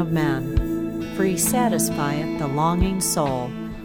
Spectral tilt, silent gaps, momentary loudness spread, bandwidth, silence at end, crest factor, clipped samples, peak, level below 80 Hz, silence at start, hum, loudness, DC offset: -5 dB/octave; none; 7 LU; 18 kHz; 0 s; 16 dB; under 0.1%; -6 dBFS; -34 dBFS; 0 s; none; -22 LUFS; 0.2%